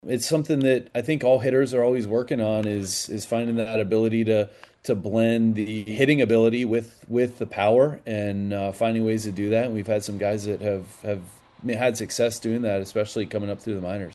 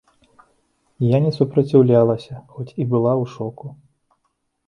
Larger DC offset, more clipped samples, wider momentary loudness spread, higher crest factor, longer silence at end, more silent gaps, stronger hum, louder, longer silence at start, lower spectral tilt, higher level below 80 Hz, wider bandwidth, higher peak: neither; neither; second, 9 LU vs 19 LU; about the same, 20 dB vs 18 dB; second, 0 s vs 0.95 s; neither; neither; second, -24 LUFS vs -18 LUFS; second, 0.05 s vs 1 s; second, -5.5 dB/octave vs -10 dB/octave; about the same, -62 dBFS vs -58 dBFS; first, 12.5 kHz vs 7 kHz; about the same, -4 dBFS vs -2 dBFS